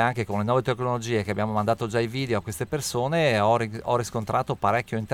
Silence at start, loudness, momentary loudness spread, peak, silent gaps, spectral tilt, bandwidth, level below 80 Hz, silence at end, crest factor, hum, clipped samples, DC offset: 0 s; -25 LUFS; 5 LU; -8 dBFS; none; -5.5 dB/octave; 17.5 kHz; -54 dBFS; 0 s; 18 dB; none; under 0.1%; under 0.1%